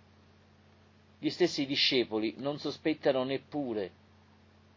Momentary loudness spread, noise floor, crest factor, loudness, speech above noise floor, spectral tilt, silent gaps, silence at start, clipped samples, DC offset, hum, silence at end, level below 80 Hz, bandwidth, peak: 10 LU; -61 dBFS; 18 dB; -31 LUFS; 30 dB; -4.5 dB/octave; none; 1.2 s; under 0.1%; under 0.1%; none; 0.85 s; -70 dBFS; 7.6 kHz; -14 dBFS